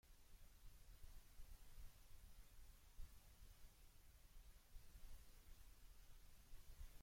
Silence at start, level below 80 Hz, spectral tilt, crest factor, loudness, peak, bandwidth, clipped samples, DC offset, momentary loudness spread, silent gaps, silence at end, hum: 0.05 s; -64 dBFS; -3.5 dB/octave; 16 dB; -68 LUFS; -44 dBFS; 16.5 kHz; under 0.1%; under 0.1%; 3 LU; none; 0 s; none